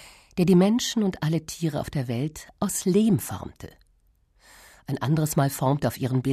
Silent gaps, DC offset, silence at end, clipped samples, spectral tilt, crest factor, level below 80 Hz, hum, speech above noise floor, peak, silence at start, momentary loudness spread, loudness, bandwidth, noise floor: none; under 0.1%; 0 s; under 0.1%; -6 dB/octave; 16 dB; -54 dBFS; none; 40 dB; -8 dBFS; 0 s; 15 LU; -25 LUFS; 14 kHz; -63 dBFS